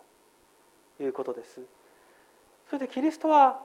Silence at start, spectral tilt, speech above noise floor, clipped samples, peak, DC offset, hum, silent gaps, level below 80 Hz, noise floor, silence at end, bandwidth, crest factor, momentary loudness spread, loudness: 1 s; -4.5 dB/octave; 36 dB; under 0.1%; -8 dBFS; under 0.1%; none; none; -80 dBFS; -62 dBFS; 0.05 s; 13 kHz; 22 dB; 22 LU; -27 LUFS